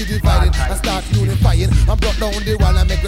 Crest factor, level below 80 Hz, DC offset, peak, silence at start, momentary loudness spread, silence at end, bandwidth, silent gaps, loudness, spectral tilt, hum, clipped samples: 12 dB; -16 dBFS; under 0.1%; -2 dBFS; 0 s; 4 LU; 0 s; 15 kHz; none; -16 LUFS; -5.5 dB/octave; none; under 0.1%